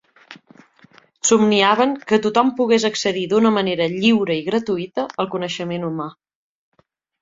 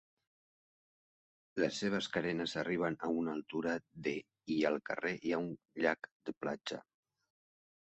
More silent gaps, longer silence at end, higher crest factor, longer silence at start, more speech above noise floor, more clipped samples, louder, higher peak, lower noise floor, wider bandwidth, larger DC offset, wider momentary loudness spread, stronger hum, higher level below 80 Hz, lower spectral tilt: second, none vs 6.11-6.20 s, 6.37-6.41 s; about the same, 1.1 s vs 1.1 s; about the same, 18 dB vs 22 dB; second, 0.3 s vs 1.55 s; second, 34 dB vs over 53 dB; neither; first, -18 LUFS vs -38 LUFS; first, -2 dBFS vs -16 dBFS; second, -52 dBFS vs under -90 dBFS; about the same, 7.8 kHz vs 8.2 kHz; neither; about the same, 10 LU vs 8 LU; neither; first, -62 dBFS vs -74 dBFS; about the same, -4 dB/octave vs -5 dB/octave